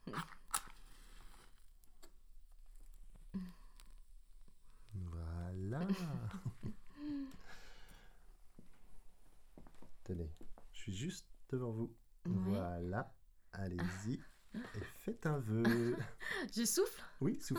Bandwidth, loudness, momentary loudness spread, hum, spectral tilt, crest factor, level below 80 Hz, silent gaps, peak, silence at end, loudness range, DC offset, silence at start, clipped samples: over 20 kHz; -42 LUFS; 23 LU; none; -5 dB/octave; 24 dB; -60 dBFS; none; -20 dBFS; 0 s; 16 LU; under 0.1%; 0.05 s; under 0.1%